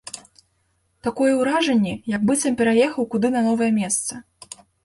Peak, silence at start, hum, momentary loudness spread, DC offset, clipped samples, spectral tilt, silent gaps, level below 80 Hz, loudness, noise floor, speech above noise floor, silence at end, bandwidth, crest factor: -6 dBFS; 0.05 s; none; 20 LU; under 0.1%; under 0.1%; -4.5 dB/octave; none; -58 dBFS; -20 LUFS; -67 dBFS; 48 dB; 0.65 s; 11.5 kHz; 14 dB